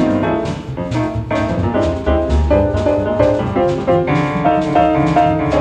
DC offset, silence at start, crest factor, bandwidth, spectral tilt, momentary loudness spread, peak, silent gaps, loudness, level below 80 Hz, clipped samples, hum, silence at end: under 0.1%; 0 s; 14 dB; 9.2 kHz; -8 dB/octave; 6 LU; 0 dBFS; none; -16 LUFS; -26 dBFS; under 0.1%; none; 0 s